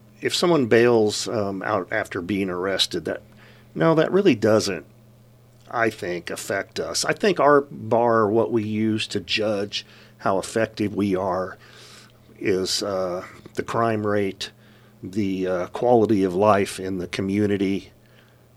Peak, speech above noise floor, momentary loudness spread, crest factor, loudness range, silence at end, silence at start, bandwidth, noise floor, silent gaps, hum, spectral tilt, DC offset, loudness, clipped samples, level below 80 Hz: -2 dBFS; 31 dB; 12 LU; 20 dB; 5 LU; 0.7 s; 0.2 s; 15.5 kHz; -53 dBFS; none; none; -5 dB/octave; under 0.1%; -22 LUFS; under 0.1%; -60 dBFS